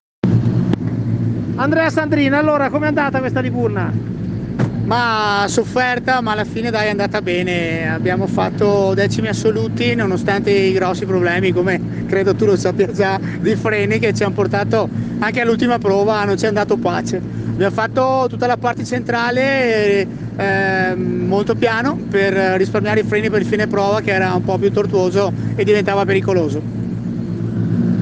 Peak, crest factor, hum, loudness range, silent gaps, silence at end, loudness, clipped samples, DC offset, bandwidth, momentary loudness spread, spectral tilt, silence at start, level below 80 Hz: -2 dBFS; 14 dB; none; 1 LU; none; 0 s; -17 LUFS; under 0.1%; under 0.1%; 9.4 kHz; 5 LU; -6.5 dB/octave; 0.25 s; -44 dBFS